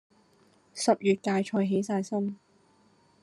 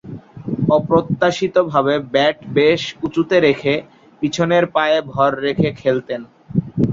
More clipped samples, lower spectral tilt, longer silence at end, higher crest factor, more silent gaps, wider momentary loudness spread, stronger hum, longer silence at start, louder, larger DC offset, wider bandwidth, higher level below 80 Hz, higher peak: neither; about the same, -5.5 dB/octave vs -6 dB/octave; first, 0.85 s vs 0 s; about the same, 20 dB vs 16 dB; neither; about the same, 11 LU vs 9 LU; neither; first, 0.75 s vs 0.05 s; second, -28 LUFS vs -17 LUFS; neither; first, 12 kHz vs 7.6 kHz; second, -76 dBFS vs -50 dBFS; second, -10 dBFS vs 0 dBFS